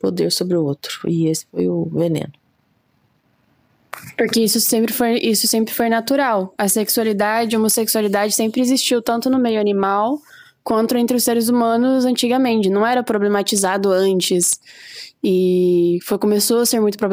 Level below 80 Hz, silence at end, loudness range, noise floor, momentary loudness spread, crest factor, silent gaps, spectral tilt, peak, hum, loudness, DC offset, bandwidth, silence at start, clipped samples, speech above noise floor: -62 dBFS; 0 s; 5 LU; -62 dBFS; 7 LU; 14 dB; none; -4 dB/octave; -4 dBFS; none; -17 LUFS; under 0.1%; 16.5 kHz; 0.05 s; under 0.1%; 45 dB